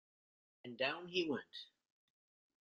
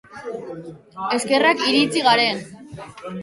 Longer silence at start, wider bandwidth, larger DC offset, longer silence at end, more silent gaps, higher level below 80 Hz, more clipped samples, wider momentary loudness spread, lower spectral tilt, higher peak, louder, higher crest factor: first, 0.65 s vs 0.1 s; second, 7.2 kHz vs 11.5 kHz; neither; first, 0.95 s vs 0 s; neither; second, -86 dBFS vs -62 dBFS; neither; second, 18 LU vs 22 LU; about the same, -4.5 dB/octave vs -3.5 dB/octave; second, -22 dBFS vs -4 dBFS; second, -40 LUFS vs -18 LUFS; about the same, 22 dB vs 18 dB